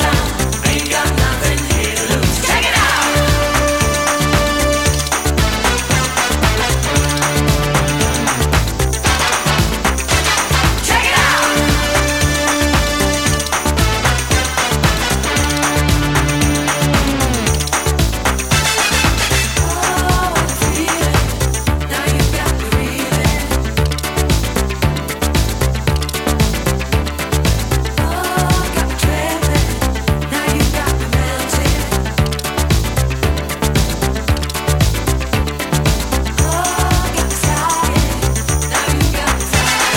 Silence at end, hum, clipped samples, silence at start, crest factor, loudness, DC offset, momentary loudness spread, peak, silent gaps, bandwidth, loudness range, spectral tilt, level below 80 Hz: 0 s; none; under 0.1%; 0 s; 14 dB; -15 LUFS; under 0.1%; 4 LU; 0 dBFS; none; 17 kHz; 3 LU; -3.5 dB/octave; -20 dBFS